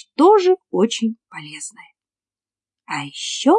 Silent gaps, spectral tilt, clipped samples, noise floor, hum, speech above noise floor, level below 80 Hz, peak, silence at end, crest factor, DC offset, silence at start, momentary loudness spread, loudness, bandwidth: none; -4 dB/octave; under 0.1%; under -90 dBFS; none; over 72 dB; -82 dBFS; -2 dBFS; 0 s; 16 dB; under 0.1%; 0.2 s; 20 LU; -18 LUFS; 11 kHz